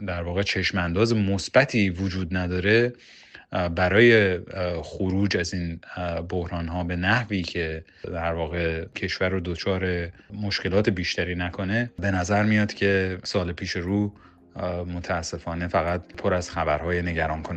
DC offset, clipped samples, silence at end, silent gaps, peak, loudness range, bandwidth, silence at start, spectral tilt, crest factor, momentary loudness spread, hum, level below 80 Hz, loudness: under 0.1%; under 0.1%; 0 s; none; -4 dBFS; 5 LU; 8.8 kHz; 0 s; -6 dB/octave; 20 dB; 10 LU; none; -44 dBFS; -25 LUFS